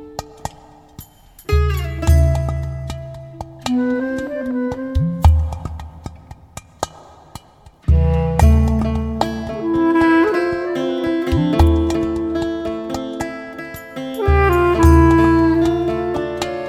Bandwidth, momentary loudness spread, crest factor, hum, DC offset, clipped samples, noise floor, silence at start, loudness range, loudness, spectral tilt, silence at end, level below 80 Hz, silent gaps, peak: 14 kHz; 18 LU; 18 dB; none; under 0.1%; under 0.1%; -46 dBFS; 0 s; 6 LU; -17 LUFS; -7.5 dB/octave; 0 s; -22 dBFS; none; 0 dBFS